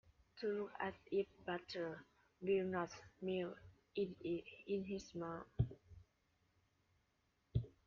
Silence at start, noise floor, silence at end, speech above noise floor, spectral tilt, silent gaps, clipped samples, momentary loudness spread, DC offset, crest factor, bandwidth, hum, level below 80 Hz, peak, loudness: 0.35 s; -82 dBFS; 0.15 s; 38 dB; -6 dB/octave; none; under 0.1%; 9 LU; under 0.1%; 22 dB; 7 kHz; none; -64 dBFS; -24 dBFS; -45 LUFS